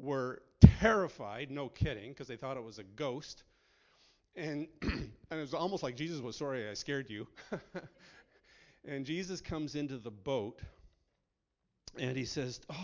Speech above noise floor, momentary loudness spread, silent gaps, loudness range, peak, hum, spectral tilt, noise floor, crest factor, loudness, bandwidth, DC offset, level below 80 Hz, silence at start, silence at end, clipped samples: 45 dB; 16 LU; none; 12 LU; -4 dBFS; none; -7 dB/octave; -84 dBFS; 32 dB; -35 LUFS; 7.6 kHz; under 0.1%; -44 dBFS; 0 s; 0 s; under 0.1%